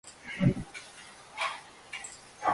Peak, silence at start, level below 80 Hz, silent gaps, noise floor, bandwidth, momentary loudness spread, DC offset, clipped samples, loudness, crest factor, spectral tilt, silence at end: -14 dBFS; 0.05 s; -56 dBFS; none; -51 dBFS; 11.5 kHz; 16 LU; under 0.1%; under 0.1%; -34 LUFS; 22 dB; -5.5 dB/octave; 0 s